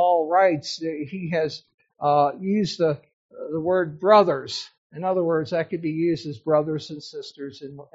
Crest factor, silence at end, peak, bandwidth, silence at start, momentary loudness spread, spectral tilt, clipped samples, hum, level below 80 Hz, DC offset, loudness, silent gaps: 20 dB; 0.1 s; -4 dBFS; 8 kHz; 0 s; 18 LU; -4.5 dB/octave; under 0.1%; none; -66 dBFS; under 0.1%; -23 LUFS; 1.74-1.78 s, 3.13-3.29 s, 4.78-4.90 s